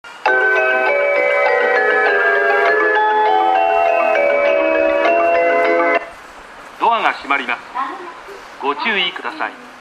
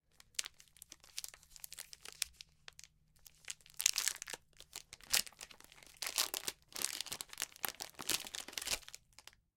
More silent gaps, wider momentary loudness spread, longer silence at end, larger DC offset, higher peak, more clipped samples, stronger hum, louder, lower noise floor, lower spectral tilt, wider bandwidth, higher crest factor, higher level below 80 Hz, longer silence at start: neither; second, 11 LU vs 21 LU; second, 0 s vs 0.6 s; neither; first, 0 dBFS vs -6 dBFS; neither; neither; first, -15 LUFS vs -39 LUFS; second, -37 dBFS vs -65 dBFS; first, -3 dB/octave vs 1.5 dB/octave; second, 12 kHz vs 17 kHz; second, 16 dB vs 38 dB; first, -56 dBFS vs -70 dBFS; second, 0.05 s vs 0.4 s